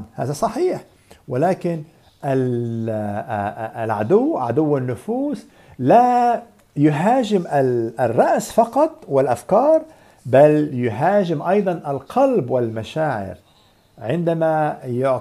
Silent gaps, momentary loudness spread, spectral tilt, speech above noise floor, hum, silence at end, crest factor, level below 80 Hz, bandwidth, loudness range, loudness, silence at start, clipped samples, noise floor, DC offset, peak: none; 11 LU; -7.5 dB/octave; 36 dB; none; 0 s; 18 dB; -58 dBFS; 14.5 kHz; 5 LU; -19 LUFS; 0 s; under 0.1%; -55 dBFS; under 0.1%; -2 dBFS